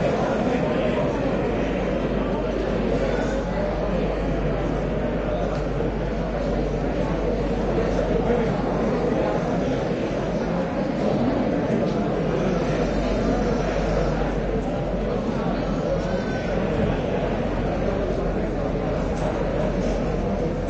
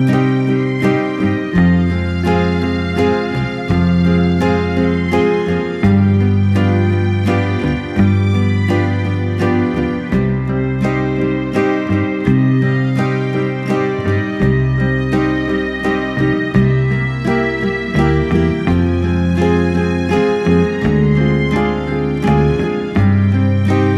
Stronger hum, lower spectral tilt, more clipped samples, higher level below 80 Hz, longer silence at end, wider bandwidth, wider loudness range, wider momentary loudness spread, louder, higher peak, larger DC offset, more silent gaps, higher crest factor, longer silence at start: neither; about the same, -7.5 dB/octave vs -8.5 dB/octave; neither; about the same, -32 dBFS vs -32 dBFS; about the same, 0 s vs 0 s; second, 8.2 kHz vs 9.8 kHz; about the same, 2 LU vs 2 LU; about the same, 3 LU vs 4 LU; second, -24 LUFS vs -15 LUFS; second, -10 dBFS vs 0 dBFS; neither; neither; about the same, 14 dB vs 14 dB; about the same, 0 s vs 0 s